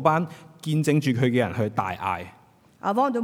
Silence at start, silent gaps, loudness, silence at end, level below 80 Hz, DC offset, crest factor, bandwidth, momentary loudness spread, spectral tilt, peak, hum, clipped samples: 0 s; none; -25 LUFS; 0 s; -66 dBFS; under 0.1%; 20 dB; 17 kHz; 12 LU; -7 dB/octave; -6 dBFS; none; under 0.1%